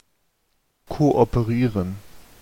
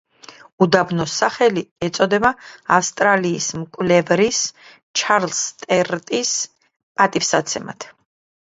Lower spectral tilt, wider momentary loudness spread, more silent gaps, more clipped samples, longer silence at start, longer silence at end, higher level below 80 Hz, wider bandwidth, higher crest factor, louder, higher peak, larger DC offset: first, -8.5 dB/octave vs -3.5 dB/octave; first, 17 LU vs 10 LU; second, none vs 0.52-0.58 s, 1.71-1.76 s, 4.82-4.94 s, 6.83-6.95 s; neither; first, 0.9 s vs 0.3 s; second, 0.2 s vs 0.6 s; first, -40 dBFS vs -56 dBFS; first, 16.5 kHz vs 8 kHz; about the same, 20 dB vs 20 dB; second, -21 LUFS vs -18 LUFS; second, -4 dBFS vs 0 dBFS; neither